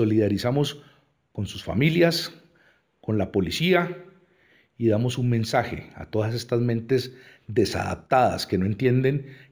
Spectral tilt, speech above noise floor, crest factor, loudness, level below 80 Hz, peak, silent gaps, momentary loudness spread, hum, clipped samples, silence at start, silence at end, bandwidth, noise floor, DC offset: -6.5 dB/octave; 38 dB; 18 dB; -24 LUFS; -52 dBFS; -6 dBFS; none; 12 LU; none; under 0.1%; 0 s; 0.15 s; over 20 kHz; -62 dBFS; under 0.1%